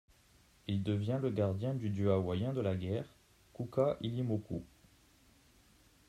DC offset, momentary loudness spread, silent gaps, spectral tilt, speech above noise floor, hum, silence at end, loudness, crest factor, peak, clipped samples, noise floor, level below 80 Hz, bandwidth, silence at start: under 0.1%; 12 LU; none; -8.5 dB/octave; 32 dB; none; 1.45 s; -36 LUFS; 18 dB; -20 dBFS; under 0.1%; -66 dBFS; -66 dBFS; 12.5 kHz; 0.65 s